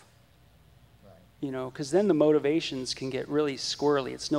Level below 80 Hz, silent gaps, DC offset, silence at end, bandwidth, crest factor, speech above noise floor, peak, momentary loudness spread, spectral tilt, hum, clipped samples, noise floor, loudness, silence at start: -62 dBFS; none; under 0.1%; 0 s; 12.5 kHz; 18 dB; 32 dB; -10 dBFS; 12 LU; -5 dB/octave; none; under 0.1%; -59 dBFS; -27 LUFS; 1.05 s